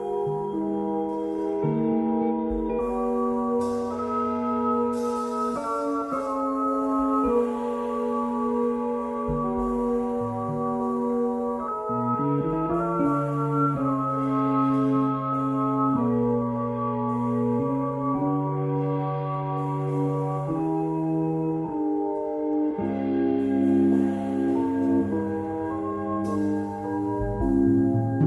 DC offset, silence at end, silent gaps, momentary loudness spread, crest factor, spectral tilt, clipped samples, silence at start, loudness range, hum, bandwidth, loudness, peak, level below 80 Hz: under 0.1%; 0 s; none; 5 LU; 14 dB; -9.5 dB/octave; under 0.1%; 0 s; 2 LU; none; 11.5 kHz; -26 LUFS; -12 dBFS; -48 dBFS